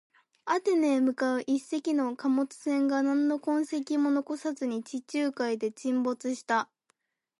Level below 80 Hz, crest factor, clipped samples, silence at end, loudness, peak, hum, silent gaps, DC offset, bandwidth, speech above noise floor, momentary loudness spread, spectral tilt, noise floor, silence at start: -84 dBFS; 14 dB; under 0.1%; 0.75 s; -29 LUFS; -14 dBFS; none; none; under 0.1%; 11.5 kHz; 47 dB; 7 LU; -4 dB/octave; -75 dBFS; 0.45 s